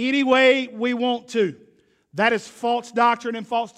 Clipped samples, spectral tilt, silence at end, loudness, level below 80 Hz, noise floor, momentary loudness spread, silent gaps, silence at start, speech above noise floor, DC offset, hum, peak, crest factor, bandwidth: under 0.1%; -4 dB/octave; 0.1 s; -21 LUFS; -70 dBFS; -58 dBFS; 10 LU; none; 0 s; 37 dB; under 0.1%; none; -4 dBFS; 18 dB; 11 kHz